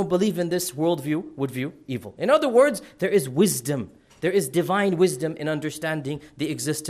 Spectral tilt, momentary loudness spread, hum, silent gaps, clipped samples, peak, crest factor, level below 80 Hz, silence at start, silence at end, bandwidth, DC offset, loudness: -5 dB/octave; 11 LU; none; none; under 0.1%; -6 dBFS; 16 dB; -62 dBFS; 0 s; 0 s; 15.5 kHz; under 0.1%; -24 LUFS